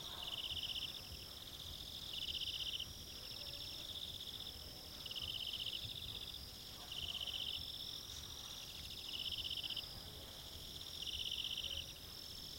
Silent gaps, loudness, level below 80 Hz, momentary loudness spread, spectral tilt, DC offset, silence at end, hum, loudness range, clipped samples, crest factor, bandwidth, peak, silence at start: none; -44 LUFS; -62 dBFS; 8 LU; -1.5 dB/octave; under 0.1%; 0 s; none; 2 LU; under 0.1%; 18 dB; 16.5 kHz; -30 dBFS; 0 s